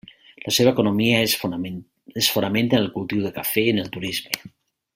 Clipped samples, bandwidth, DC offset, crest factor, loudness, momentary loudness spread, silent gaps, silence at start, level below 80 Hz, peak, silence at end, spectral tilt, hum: under 0.1%; 16.5 kHz; under 0.1%; 22 dB; -21 LUFS; 12 LU; none; 0.45 s; -58 dBFS; 0 dBFS; 0.45 s; -4 dB/octave; none